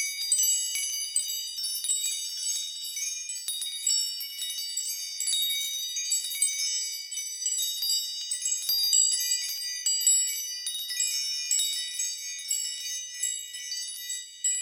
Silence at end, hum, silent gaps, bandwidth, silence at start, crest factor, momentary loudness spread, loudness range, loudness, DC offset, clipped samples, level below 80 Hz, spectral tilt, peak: 0 s; none; none; 19 kHz; 0 s; 18 dB; 10 LU; 4 LU; -27 LUFS; under 0.1%; under 0.1%; -76 dBFS; 6 dB/octave; -10 dBFS